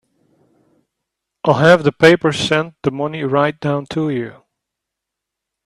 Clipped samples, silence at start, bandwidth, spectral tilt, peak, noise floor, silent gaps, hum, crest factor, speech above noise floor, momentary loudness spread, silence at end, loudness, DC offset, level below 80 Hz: under 0.1%; 1.45 s; 12.5 kHz; -6 dB/octave; 0 dBFS; -81 dBFS; none; none; 18 dB; 66 dB; 11 LU; 1.35 s; -16 LUFS; under 0.1%; -54 dBFS